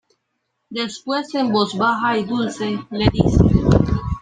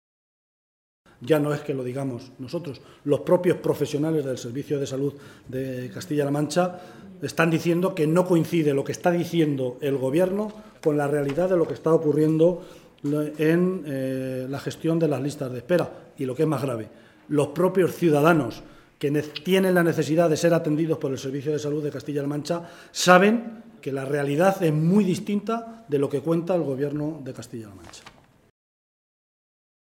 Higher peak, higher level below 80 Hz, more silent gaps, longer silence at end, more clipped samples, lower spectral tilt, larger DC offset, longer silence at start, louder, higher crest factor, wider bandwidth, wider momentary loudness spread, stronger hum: about the same, 0 dBFS vs 0 dBFS; first, -30 dBFS vs -62 dBFS; neither; second, 0 s vs 1.8 s; neither; about the same, -7 dB/octave vs -6.5 dB/octave; neither; second, 0.7 s vs 1.2 s; first, -19 LUFS vs -24 LUFS; second, 18 dB vs 24 dB; second, 9.6 kHz vs 17 kHz; second, 10 LU vs 13 LU; neither